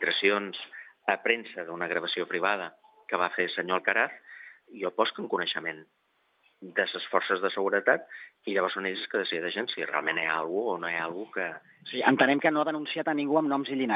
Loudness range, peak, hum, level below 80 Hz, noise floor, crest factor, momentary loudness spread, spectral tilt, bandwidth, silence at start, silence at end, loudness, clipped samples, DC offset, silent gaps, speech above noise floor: 3 LU; -6 dBFS; none; under -90 dBFS; -71 dBFS; 22 dB; 13 LU; -7.5 dB/octave; 5.2 kHz; 0 s; 0 s; -28 LUFS; under 0.1%; under 0.1%; none; 42 dB